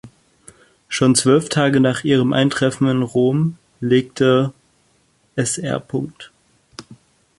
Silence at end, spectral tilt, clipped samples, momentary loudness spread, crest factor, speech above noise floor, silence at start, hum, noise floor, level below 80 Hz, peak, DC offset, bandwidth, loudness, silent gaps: 0.45 s; -5 dB/octave; under 0.1%; 12 LU; 16 dB; 43 dB; 0.05 s; none; -60 dBFS; -56 dBFS; -2 dBFS; under 0.1%; 11.5 kHz; -18 LUFS; none